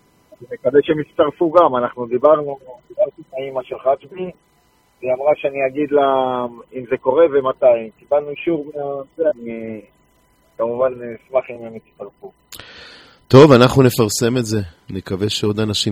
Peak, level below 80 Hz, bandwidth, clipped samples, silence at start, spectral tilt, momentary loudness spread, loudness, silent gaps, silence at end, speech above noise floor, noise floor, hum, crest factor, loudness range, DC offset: 0 dBFS; -50 dBFS; 16 kHz; under 0.1%; 0.4 s; -6 dB/octave; 20 LU; -17 LUFS; none; 0 s; 41 dB; -58 dBFS; none; 18 dB; 9 LU; under 0.1%